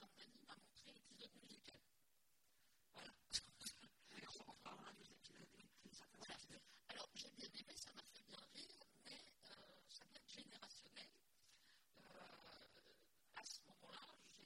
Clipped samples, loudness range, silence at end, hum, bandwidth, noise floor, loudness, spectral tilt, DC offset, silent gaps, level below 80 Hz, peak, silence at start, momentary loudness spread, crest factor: under 0.1%; 7 LU; 0 s; none; 16 kHz; -83 dBFS; -59 LUFS; -1 dB/octave; under 0.1%; none; -86 dBFS; -30 dBFS; 0 s; 10 LU; 32 dB